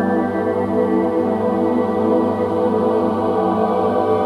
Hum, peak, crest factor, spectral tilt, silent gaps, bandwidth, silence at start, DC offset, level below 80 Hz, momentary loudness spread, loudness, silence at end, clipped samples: none; -4 dBFS; 12 dB; -8.5 dB/octave; none; 11 kHz; 0 s; under 0.1%; -52 dBFS; 2 LU; -18 LUFS; 0 s; under 0.1%